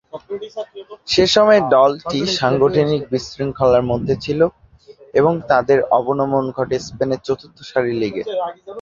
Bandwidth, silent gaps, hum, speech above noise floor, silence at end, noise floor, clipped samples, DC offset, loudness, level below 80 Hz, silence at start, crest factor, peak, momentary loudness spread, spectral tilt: 7.6 kHz; none; none; 28 dB; 0 s; -45 dBFS; under 0.1%; under 0.1%; -17 LUFS; -48 dBFS; 0.15 s; 16 dB; -2 dBFS; 15 LU; -5.5 dB/octave